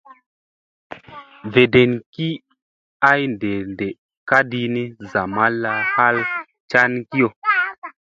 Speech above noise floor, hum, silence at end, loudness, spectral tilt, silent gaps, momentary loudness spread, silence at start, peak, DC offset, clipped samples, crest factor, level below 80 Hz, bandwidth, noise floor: 23 dB; none; 0.2 s; -18 LUFS; -7 dB/octave; 2.06-2.13 s, 2.62-3.00 s, 3.98-4.09 s, 4.17-4.26 s, 6.60-6.68 s, 7.36-7.42 s, 7.78-7.82 s; 15 LU; 0.9 s; 0 dBFS; under 0.1%; under 0.1%; 20 dB; -56 dBFS; 7.4 kHz; -41 dBFS